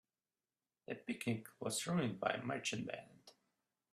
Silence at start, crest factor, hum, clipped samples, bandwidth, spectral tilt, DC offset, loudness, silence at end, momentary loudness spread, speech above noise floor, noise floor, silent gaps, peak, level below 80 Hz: 0.9 s; 24 dB; none; under 0.1%; 14.5 kHz; -4.5 dB/octave; under 0.1%; -42 LUFS; 0.6 s; 13 LU; over 49 dB; under -90 dBFS; none; -20 dBFS; -80 dBFS